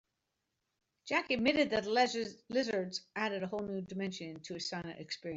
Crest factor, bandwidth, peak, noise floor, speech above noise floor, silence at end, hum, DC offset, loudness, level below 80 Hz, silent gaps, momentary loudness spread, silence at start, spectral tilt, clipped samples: 20 dB; 8 kHz; -16 dBFS; -85 dBFS; 50 dB; 0 s; none; under 0.1%; -35 LUFS; -70 dBFS; none; 12 LU; 1.05 s; -4 dB/octave; under 0.1%